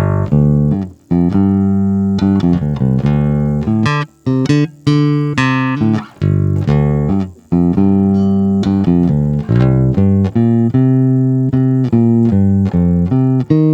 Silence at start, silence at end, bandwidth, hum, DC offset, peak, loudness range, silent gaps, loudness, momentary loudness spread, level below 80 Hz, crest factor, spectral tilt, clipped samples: 0 s; 0 s; 8.2 kHz; none; under 0.1%; 0 dBFS; 2 LU; none; -13 LUFS; 4 LU; -32 dBFS; 12 dB; -9 dB/octave; under 0.1%